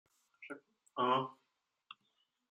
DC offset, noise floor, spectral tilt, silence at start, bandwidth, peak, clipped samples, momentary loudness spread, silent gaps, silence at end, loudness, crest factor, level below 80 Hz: under 0.1%; -84 dBFS; -6 dB/octave; 0.4 s; 11 kHz; -20 dBFS; under 0.1%; 24 LU; none; 1.2 s; -36 LUFS; 22 dB; under -90 dBFS